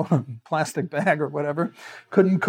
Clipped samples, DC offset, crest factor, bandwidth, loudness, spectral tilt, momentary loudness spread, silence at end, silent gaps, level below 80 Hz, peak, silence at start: under 0.1%; under 0.1%; 20 dB; 16 kHz; -24 LUFS; -7 dB/octave; 7 LU; 0 s; none; -76 dBFS; -4 dBFS; 0 s